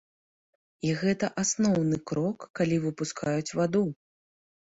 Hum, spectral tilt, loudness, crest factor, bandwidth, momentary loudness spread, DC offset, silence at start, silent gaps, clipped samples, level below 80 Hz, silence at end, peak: none; -5.5 dB/octave; -28 LUFS; 16 dB; 8 kHz; 7 LU; under 0.1%; 0.85 s; 2.50-2.54 s; under 0.1%; -62 dBFS; 0.75 s; -14 dBFS